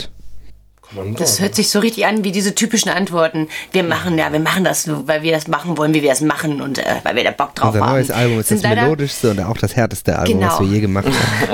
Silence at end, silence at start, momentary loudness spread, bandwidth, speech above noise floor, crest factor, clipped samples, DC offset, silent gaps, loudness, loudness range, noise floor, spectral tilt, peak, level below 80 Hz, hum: 0 s; 0 s; 5 LU; 19 kHz; 22 dB; 16 dB; under 0.1%; under 0.1%; none; -16 LUFS; 1 LU; -38 dBFS; -4.5 dB/octave; -2 dBFS; -44 dBFS; none